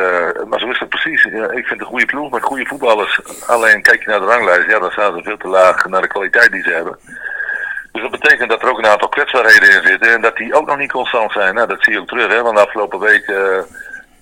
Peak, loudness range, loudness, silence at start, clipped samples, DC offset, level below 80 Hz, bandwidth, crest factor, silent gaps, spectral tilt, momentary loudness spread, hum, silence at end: 0 dBFS; 4 LU; -12 LUFS; 0 s; 0.6%; under 0.1%; -52 dBFS; over 20 kHz; 14 dB; none; -2.5 dB/octave; 11 LU; none; 0.2 s